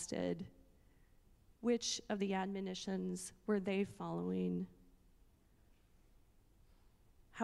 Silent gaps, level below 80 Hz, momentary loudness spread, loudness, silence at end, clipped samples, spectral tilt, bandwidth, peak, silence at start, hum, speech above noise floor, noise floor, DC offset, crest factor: none; -68 dBFS; 8 LU; -40 LUFS; 0 s; under 0.1%; -5 dB/octave; 13 kHz; -22 dBFS; 0 s; none; 29 dB; -69 dBFS; under 0.1%; 22 dB